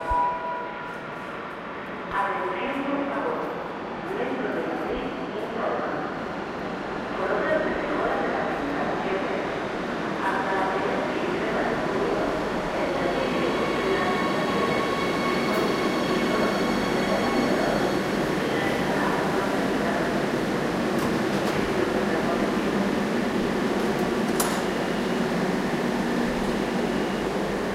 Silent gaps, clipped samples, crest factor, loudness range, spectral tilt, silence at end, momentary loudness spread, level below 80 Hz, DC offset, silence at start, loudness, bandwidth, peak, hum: none; under 0.1%; 18 dB; 5 LU; -5 dB/octave; 0 s; 7 LU; -48 dBFS; under 0.1%; 0 s; -26 LUFS; 16 kHz; -8 dBFS; none